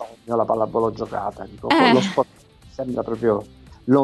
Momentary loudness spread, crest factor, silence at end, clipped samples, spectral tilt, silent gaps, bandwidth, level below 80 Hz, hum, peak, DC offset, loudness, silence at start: 16 LU; 20 dB; 0 s; under 0.1%; -6 dB/octave; none; 12 kHz; -52 dBFS; none; -2 dBFS; under 0.1%; -21 LUFS; 0 s